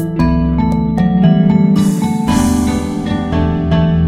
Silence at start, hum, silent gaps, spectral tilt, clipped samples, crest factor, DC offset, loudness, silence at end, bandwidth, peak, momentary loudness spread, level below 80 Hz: 0 s; none; none; -7 dB/octave; under 0.1%; 12 dB; 0.3%; -13 LUFS; 0 s; 14.5 kHz; 0 dBFS; 6 LU; -24 dBFS